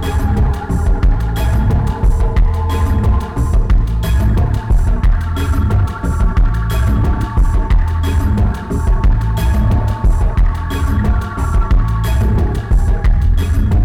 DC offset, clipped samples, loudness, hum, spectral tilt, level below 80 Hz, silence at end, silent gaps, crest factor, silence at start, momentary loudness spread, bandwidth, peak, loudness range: under 0.1%; under 0.1%; -16 LUFS; none; -7.5 dB/octave; -14 dBFS; 0 s; none; 8 dB; 0 s; 3 LU; 14.5 kHz; -4 dBFS; 0 LU